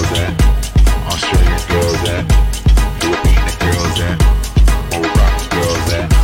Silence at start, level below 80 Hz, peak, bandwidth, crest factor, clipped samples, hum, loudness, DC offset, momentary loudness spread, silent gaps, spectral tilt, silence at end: 0 s; -14 dBFS; -2 dBFS; 16.5 kHz; 10 dB; under 0.1%; none; -14 LUFS; under 0.1%; 3 LU; none; -5 dB/octave; 0 s